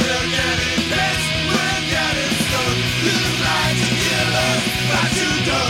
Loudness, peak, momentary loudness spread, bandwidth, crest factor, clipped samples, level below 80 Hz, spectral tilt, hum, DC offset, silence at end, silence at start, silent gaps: -17 LUFS; -6 dBFS; 1 LU; 17 kHz; 14 dB; under 0.1%; -36 dBFS; -3.5 dB/octave; none; under 0.1%; 0 s; 0 s; none